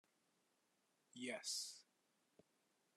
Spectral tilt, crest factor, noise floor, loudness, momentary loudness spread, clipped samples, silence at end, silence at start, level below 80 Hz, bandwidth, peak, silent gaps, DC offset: -0.5 dB/octave; 22 dB; -84 dBFS; -48 LUFS; 18 LU; under 0.1%; 1.15 s; 1.15 s; under -90 dBFS; 13 kHz; -32 dBFS; none; under 0.1%